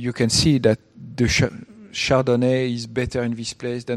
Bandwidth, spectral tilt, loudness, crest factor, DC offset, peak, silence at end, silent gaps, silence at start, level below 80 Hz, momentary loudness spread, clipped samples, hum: 13 kHz; -5 dB/octave; -21 LUFS; 18 dB; under 0.1%; -2 dBFS; 0 s; none; 0 s; -40 dBFS; 11 LU; under 0.1%; none